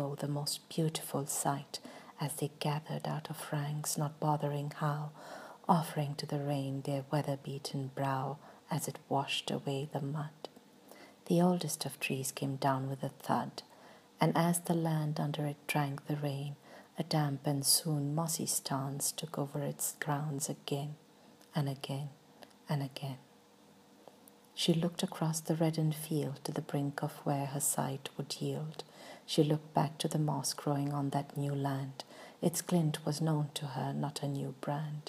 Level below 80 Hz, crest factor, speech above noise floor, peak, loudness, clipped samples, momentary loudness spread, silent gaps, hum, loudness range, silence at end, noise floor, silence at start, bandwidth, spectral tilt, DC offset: -82 dBFS; 24 dB; 27 dB; -12 dBFS; -35 LUFS; under 0.1%; 12 LU; none; none; 5 LU; 0.05 s; -62 dBFS; 0 s; 15.5 kHz; -5 dB/octave; under 0.1%